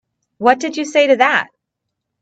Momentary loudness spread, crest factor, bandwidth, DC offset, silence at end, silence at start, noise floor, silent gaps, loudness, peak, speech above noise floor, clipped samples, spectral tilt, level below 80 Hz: 7 LU; 16 dB; 8.4 kHz; under 0.1%; 0.75 s; 0.4 s; -78 dBFS; none; -15 LUFS; 0 dBFS; 64 dB; under 0.1%; -3 dB/octave; -66 dBFS